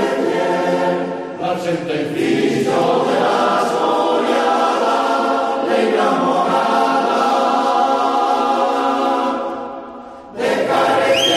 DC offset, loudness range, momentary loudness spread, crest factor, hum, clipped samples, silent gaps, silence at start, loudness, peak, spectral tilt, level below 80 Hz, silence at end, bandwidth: under 0.1%; 2 LU; 7 LU; 12 dB; none; under 0.1%; none; 0 s; -16 LUFS; -4 dBFS; -4.5 dB/octave; -60 dBFS; 0 s; 14.5 kHz